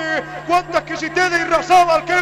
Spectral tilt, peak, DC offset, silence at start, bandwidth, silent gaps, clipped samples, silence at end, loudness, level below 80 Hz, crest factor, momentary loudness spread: -3.5 dB/octave; -4 dBFS; under 0.1%; 0 s; 13.5 kHz; none; under 0.1%; 0 s; -16 LUFS; -48 dBFS; 14 dB; 9 LU